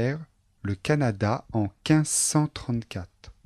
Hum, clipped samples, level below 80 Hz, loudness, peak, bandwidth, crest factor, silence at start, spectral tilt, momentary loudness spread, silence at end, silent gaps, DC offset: none; under 0.1%; -52 dBFS; -26 LUFS; -10 dBFS; 13 kHz; 16 dB; 0 s; -5 dB/octave; 15 LU; 0.15 s; none; under 0.1%